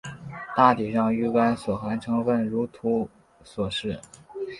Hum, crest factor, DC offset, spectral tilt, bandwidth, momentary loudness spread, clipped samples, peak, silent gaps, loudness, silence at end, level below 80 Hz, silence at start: none; 22 dB; under 0.1%; -6.5 dB/octave; 11.5 kHz; 18 LU; under 0.1%; -2 dBFS; none; -25 LUFS; 0 s; -56 dBFS; 0.05 s